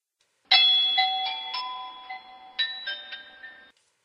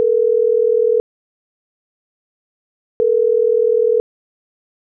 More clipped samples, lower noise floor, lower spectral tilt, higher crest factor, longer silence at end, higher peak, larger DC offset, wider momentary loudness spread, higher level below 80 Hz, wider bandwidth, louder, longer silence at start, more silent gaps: neither; second, -70 dBFS vs under -90 dBFS; about the same, 1 dB/octave vs 0 dB/octave; first, 22 dB vs 10 dB; second, 0.5 s vs 1 s; about the same, -6 dBFS vs -8 dBFS; neither; first, 23 LU vs 5 LU; second, -78 dBFS vs -58 dBFS; first, 9.6 kHz vs 1.4 kHz; second, -22 LUFS vs -16 LUFS; first, 0.5 s vs 0 s; second, none vs 1.00-3.00 s